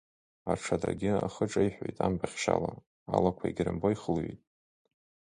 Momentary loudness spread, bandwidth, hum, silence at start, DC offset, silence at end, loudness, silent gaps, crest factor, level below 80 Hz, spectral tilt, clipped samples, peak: 8 LU; 11.5 kHz; none; 0.45 s; under 0.1%; 1 s; -32 LUFS; 2.87-3.06 s; 24 dB; -54 dBFS; -6 dB/octave; under 0.1%; -8 dBFS